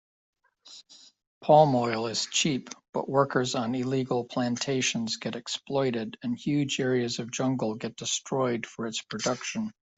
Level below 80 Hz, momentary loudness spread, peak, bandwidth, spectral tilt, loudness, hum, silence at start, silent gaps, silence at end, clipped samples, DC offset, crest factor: -68 dBFS; 10 LU; -8 dBFS; 8.2 kHz; -4 dB/octave; -28 LUFS; none; 0.65 s; 1.27-1.41 s, 2.89-2.93 s; 0.25 s; under 0.1%; under 0.1%; 22 dB